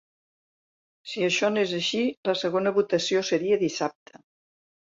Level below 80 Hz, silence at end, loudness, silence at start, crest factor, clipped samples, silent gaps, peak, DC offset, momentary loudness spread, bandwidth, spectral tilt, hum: -72 dBFS; 1.05 s; -25 LUFS; 1.05 s; 16 dB; under 0.1%; 2.17-2.23 s; -10 dBFS; under 0.1%; 7 LU; 7.8 kHz; -4 dB/octave; none